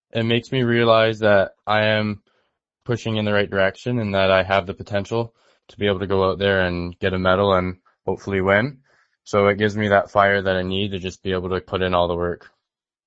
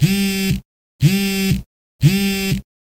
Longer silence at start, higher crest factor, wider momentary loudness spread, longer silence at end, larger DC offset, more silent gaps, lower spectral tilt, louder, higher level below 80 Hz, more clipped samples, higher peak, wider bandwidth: first, 0.15 s vs 0 s; about the same, 20 dB vs 18 dB; first, 11 LU vs 7 LU; first, 0.7 s vs 0.4 s; neither; second, none vs 0.65-0.99 s, 1.66-1.99 s; about the same, -6.5 dB/octave vs -5.5 dB/octave; about the same, -20 LUFS vs -18 LUFS; second, -50 dBFS vs -38 dBFS; neither; about the same, 0 dBFS vs -2 dBFS; second, 8 kHz vs 16.5 kHz